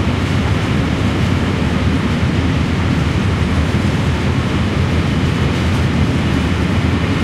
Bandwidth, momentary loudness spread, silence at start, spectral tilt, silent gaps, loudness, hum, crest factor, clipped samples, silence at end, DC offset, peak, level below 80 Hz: 12.5 kHz; 1 LU; 0 s; -6.5 dB/octave; none; -16 LUFS; none; 14 dB; under 0.1%; 0 s; under 0.1%; -2 dBFS; -24 dBFS